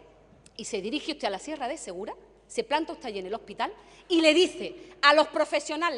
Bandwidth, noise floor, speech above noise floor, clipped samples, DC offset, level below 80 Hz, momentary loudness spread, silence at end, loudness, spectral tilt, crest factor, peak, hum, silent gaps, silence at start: 11.5 kHz; -56 dBFS; 29 dB; under 0.1%; under 0.1%; -64 dBFS; 18 LU; 0 s; -27 LUFS; -2.5 dB/octave; 24 dB; -4 dBFS; none; none; 0.6 s